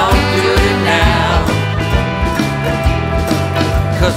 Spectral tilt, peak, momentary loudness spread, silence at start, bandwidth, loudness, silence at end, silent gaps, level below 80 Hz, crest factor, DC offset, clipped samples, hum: -5.5 dB/octave; 0 dBFS; 4 LU; 0 s; 16 kHz; -14 LUFS; 0 s; none; -20 dBFS; 12 dB; under 0.1%; under 0.1%; none